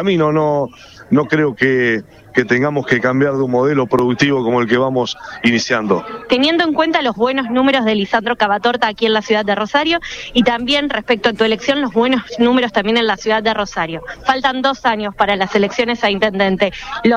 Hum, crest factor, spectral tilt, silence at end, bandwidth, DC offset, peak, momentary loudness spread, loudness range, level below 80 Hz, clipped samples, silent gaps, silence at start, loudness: none; 14 dB; -5 dB/octave; 0 s; 9.8 kHz; under 0.1%; 0 dBFS; 5 LU; 1 LU; -46 dBFS; under 0.1%; none; 0 s; -15 LUFS